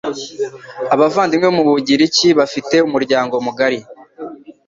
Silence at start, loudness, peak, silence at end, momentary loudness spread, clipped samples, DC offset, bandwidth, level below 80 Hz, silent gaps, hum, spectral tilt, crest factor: 0.05 s; -15 LUFS; 0 dBFS; 0.15 s; 14 LU; under 0.1%; under 0.1%; 7.6 kHz; -58 dBFS; none; none; -4 dB/octave; 14 dB